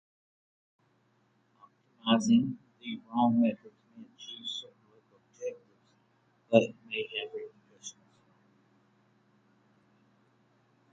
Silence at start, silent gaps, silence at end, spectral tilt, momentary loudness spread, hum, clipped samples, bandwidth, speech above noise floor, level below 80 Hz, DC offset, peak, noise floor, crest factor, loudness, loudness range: 2.05 s; none; 3 s; -5 dB/octave; 21 LU; none; under 0.1%; 8.4 kHz; 42 dB; -78 dBFS; under 0.1%; -6 dBFS; -70 dBFS; 28 dB; -30 LUFS; 12 LU